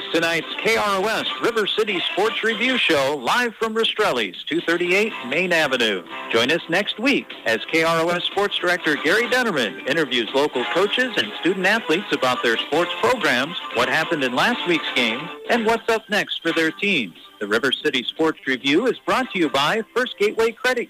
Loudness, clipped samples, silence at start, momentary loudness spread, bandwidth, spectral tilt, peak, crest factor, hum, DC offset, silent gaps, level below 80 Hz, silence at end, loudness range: -20 LUFS; under 0.1%; 0 s; 4 LU; 15.5 kHz; -3.5 dB/octave; -8 dBFS; 14 dB; none; under 0.1%; none; -60 dBFS; 0.05 s; 1 LU